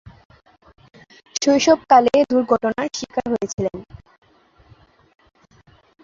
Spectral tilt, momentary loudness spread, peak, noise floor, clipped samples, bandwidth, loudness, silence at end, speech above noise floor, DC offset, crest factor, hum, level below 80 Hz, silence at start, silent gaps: -4 dB/octave; 13 LU; -2 dBFS; -54 dBFS; under 0.1%; 7.8 kHz; -18 LUFS; 2.2 s; 36 dB; under 0.1%; 20 dB; none; -54 dBFS; 0.05 s; 0.25-0.30 s